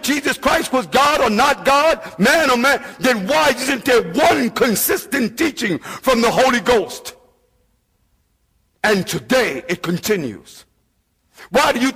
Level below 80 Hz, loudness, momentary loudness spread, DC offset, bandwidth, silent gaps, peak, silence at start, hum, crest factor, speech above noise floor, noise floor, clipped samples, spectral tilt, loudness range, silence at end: -46 dBFS; -16 LUFS; 8 LU; under 0.1%; 16 kHz; none; -4 dBFS; 0 s; none; 14 dB; 48 dB; -64 dBFS; under 0.1%; -3.5 dB/octave; 6 LU; 0 s